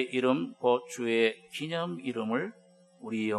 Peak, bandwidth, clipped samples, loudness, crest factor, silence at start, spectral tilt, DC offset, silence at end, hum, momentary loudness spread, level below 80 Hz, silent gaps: -12 dBFS; 13 kHz; under 0.1%; -31 LUFS; 20 dB; 0 s; -5 dB/octave; under 0.1%; 0 s; none; 11 LU; -88 dBFS; none